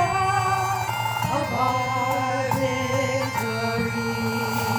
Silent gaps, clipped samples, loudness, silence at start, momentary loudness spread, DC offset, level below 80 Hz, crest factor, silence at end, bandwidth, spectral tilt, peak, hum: none; under 0.1%; -24 LUFS; 0 s; 3 LU; under 0.1%; -52 dBFS; 14 dB; 0 s; over 20 kHz; -5 dB/octave; -10 dBFS; none